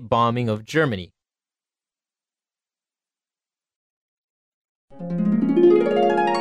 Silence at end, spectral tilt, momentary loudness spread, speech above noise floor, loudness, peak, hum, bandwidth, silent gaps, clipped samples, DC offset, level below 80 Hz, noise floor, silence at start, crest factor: 0 s; -7.5 dB/octave; 13 LU; over 69 dB; -20 LUFS; -6 dBFS; none; 9.2 kHz; 3.76-4.88 s; under 0.1%; under 0.1%; -60 dBFS; under -90 dBFS; 0 s; 18 dB